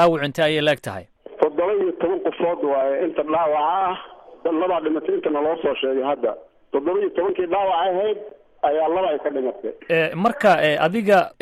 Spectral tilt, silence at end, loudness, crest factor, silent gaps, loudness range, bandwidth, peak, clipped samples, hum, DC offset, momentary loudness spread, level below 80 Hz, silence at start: -6 dB/octave; 0.1 s; -21 LUFS; 16 dB; none; 2 LU; 14 kHz; -4 dBFS; under 0.1%; none; under 0.1%; 8 LU; -60 dBFS; 0 s